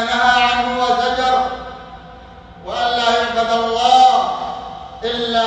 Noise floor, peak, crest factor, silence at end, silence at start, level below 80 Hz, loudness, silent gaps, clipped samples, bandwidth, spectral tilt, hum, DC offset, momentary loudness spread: -38 dBFS; -2 dBFS; 16 dB; 0 s; 0 s; -44 dBFS; -16 LUFS; none; under 0.1%; 9 kHz; -2.5 dB/octave; none; under 0.1%; 19 LU